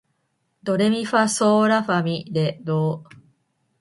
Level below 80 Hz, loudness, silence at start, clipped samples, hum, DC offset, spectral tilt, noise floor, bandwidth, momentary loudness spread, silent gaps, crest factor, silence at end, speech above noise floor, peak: -66 dBFS; -21 LUFS; 0.65 s; under 0.1%; none; under 0.1%; -5.5 dB/octave; -71 dBFS; 11.5 kHz; 8 LU; none; 18 dB; 0.75 s; 51 dB; -4 dBFS